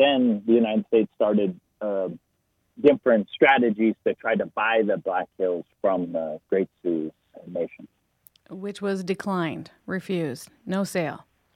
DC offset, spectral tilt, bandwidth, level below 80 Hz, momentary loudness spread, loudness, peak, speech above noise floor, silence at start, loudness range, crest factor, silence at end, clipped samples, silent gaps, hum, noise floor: under 0.1%; -6 dB/octave; 15.5 kHz; -70 dBFS; 14 LU; -24 LUFS; -4 dBFS; 48 dB; 0 s; 8 LU; 20 dB; 0.4 s; under 0.1%; none; none; -72 dBFS